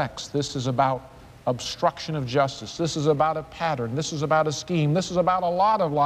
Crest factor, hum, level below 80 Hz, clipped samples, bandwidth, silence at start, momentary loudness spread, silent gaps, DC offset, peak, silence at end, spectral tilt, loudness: 16 dB; none; -54 dBFS; under 0.1%; 13.5 kHz; 0 s; 7 LU; none; under 0.1%; -8 dBFS; 0 s; -5.5 dB/octave; -24 LUFS